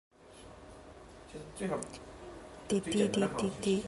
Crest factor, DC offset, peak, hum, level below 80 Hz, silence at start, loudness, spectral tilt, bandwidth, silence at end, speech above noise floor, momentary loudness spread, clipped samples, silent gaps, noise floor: 20 dB; under 0.1%; -16 dBFS; none; -58 dBFS; 0.2 s; -34 LUFS; -5 dB/octave; 11.5 kHz; 0 s; 21 dB; 22 LU; under 0.1%; none; -54 dBFS